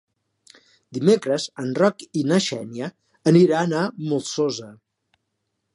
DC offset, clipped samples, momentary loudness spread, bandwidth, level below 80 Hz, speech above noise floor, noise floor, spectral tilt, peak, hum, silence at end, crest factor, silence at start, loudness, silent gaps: under 0.1%; under 0.1%; 16 LU; 11.5 kHz; -70 dBFS; 56 dB; -76 dBFS; -6 dB/octave; -4 dBFS; none; 1 s; 20 dB; 0.9 s; -21 LUFS; none